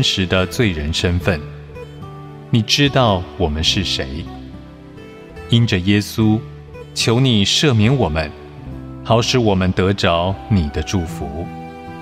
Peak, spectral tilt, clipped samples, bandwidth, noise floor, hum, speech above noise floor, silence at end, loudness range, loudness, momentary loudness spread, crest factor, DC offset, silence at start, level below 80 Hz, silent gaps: -2 dBFS; -5 dB/octave; under 0.1%; 15.5 kHz; -37 dBFS; none; 20 dB; 0 s; 3 LU; -17 LUFS; 21 LU; 16 dB; under 0.1%; 0 s; -36 dBFS; none